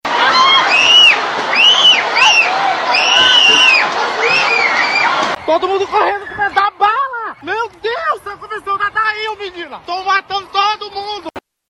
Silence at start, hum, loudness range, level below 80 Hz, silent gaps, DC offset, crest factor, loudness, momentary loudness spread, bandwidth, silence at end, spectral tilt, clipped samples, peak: 0.05 s; none; 10 LU; -56 dBFS; none; under 0.1%; 14 dB; -10 LUFS; 17 LU; 12 kHz; 0.3 s; 0 dB/octave; under 0.1%; 0 dBFS